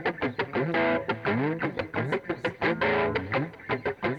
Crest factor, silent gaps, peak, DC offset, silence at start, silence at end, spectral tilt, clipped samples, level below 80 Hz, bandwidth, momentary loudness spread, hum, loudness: 16 dB; none; -12 dBFS; under 0.1%; 0 s; 0 s; -7.5 dB/octave; under 0.1%; -56 dBFS; 9.6 kHz; 6 LU; none; -28 LUFS